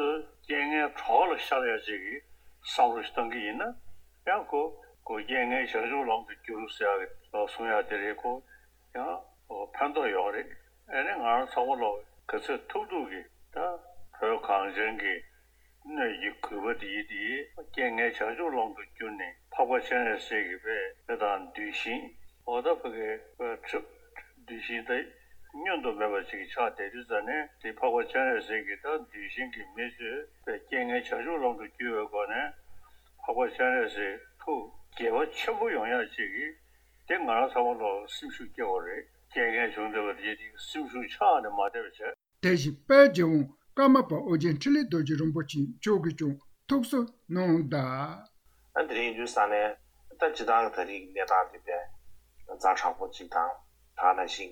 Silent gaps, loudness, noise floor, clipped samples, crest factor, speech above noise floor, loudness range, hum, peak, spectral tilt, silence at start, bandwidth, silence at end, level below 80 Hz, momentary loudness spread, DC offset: none; -30 LUFS; -62 dBFS; under 0.1%; 24 dB; 33 dB; 8 LU; none; -6 dBFS; -5.5 dB/octave; 0 s; over 20 kHz; 0 s; -64 dBFS; 13 LU; under 0.1%